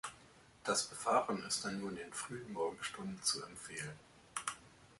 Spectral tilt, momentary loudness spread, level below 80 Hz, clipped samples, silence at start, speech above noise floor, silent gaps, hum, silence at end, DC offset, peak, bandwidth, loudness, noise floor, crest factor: -2.5 dB/octave; 12 LU; -72 dBFS; under 0.1%; 0.05 s; 23 dB; none; none; 0.05 s; under 0.1%; -20 dBFS; 12 kHz; -40 LUFS; -63 dBFS; 22 dB